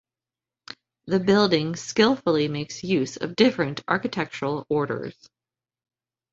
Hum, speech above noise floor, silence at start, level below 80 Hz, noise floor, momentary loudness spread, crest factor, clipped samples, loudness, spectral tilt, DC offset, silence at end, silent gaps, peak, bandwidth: none; over 67 dB; 1.05 s; -62 dBFS; under -90 dBFS; 15 LU; 20 dB; under 0.1%; -24 LUFS; -5 dB/octave; under 0.1%; 1.2 s; none; -4 dBFS; 8 kHz